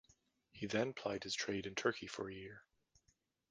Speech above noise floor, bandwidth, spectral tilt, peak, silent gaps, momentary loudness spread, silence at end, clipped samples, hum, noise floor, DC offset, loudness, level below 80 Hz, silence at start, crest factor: 38 dB; 10 kHz; -3.5 dB/octave; -20 dBFS; none; 13 LU; 0.9 s; under 0.1%; none; -80 dBFS; under 0.1%; -41 LUFS; -72 dBFS; 0.55 s; 24 dB